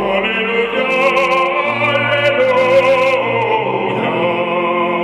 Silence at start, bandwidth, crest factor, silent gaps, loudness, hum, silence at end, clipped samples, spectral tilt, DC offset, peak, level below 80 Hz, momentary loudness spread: 0 s; 11.5 kHz; 12 dB; none; -14 LUFS; none; 0 s; under 0.1%; -5.5 dB/octave; under 0.1%; -2 dBFS; -52 dBFS; 5 LU